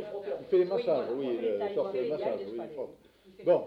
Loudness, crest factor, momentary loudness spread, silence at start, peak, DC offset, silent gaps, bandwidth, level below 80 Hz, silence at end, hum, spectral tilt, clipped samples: -32 LUFS; 18 dB; 11 LU; 0 s; -14 dBFS; under 0.1%; none; 5.4 kHz; -72 dBFS; 0 s; none; -8 dB/octave; under 0.1%